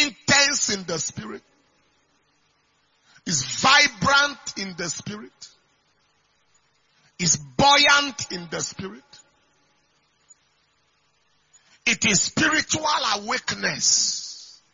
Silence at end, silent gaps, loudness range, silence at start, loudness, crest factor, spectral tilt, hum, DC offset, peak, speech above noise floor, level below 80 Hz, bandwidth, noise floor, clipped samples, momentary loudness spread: 0.25 s; none; 8 LU; 0 s; -20 LUFS; 22 dB; -1.5 dB/octave; none; under 0.1%; -2 dBFS; 44 dB; -58 dBFS; 7.6 kHz; -66 dBFS; under 0.1%; 21 LU